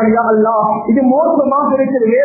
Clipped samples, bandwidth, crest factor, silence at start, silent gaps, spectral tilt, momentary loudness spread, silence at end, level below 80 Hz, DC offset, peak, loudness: under 0.1%; 2.7 kHz; 12 dB; 0 s; none; -16.5 dB/octave; 2 LU; 0 s; -52 dBFS; under 0.1%; 0 dBFS; -12 LUFS